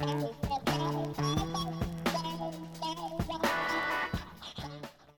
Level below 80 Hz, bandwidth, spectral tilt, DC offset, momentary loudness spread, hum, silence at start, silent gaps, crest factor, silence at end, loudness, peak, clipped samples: -50 dBFS; 17.5 kHz; -5 dB/octave; under 0.1%; 11 LU; none; 0 s; none; 18 dB; 0.05 s; -34 LUFS; -16 dBFS; under 0.1%